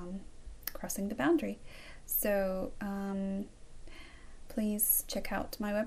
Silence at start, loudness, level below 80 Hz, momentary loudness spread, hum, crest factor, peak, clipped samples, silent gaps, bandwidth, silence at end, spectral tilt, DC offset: 0 s; -34 LUFS; -50 dBFS; 22 LU; none; 20 dB; -16 dBFS; under 0.1%; none; 16 kHz; 0 s; -4 dB/octave; under 0.1%